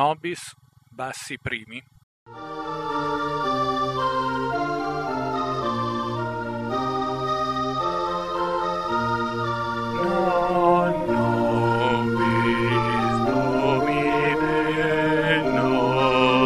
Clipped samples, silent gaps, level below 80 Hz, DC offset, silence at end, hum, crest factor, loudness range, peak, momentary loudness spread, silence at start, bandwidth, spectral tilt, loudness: under 0.1%; 2.03-2.26 s; -50 dBFS; 0.3%; 0 s; none; 18 dB; 6 LU; -4 dBFS; 10 LU; 0 s; 14 kHz; -6 dB/octave; -23 LUFS